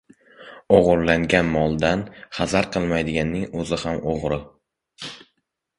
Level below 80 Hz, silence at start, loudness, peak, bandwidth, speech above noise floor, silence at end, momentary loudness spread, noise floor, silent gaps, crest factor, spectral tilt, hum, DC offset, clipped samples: -42 dBFS; 0.4 s; -21 LUFS; 0 dBFS; 11.5 kHz; 53 dB; 0.6 s; 15 LU; -74 dBFS; none; 22 dB; -6 dB/octave; none; under 0.1%; under 0.1%